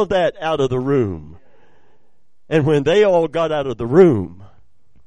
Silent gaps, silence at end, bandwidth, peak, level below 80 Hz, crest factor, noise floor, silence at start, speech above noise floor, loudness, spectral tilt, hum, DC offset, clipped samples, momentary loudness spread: none; 0.6 s; 9.8 kHz; 0 dBFS; -48 dBFS; 18 dB; -67 dBFS; 0 s; 50 dB; -17 LUFS; -7.5 dB/octave; none; 0.9%; under 0.1%; 10 LU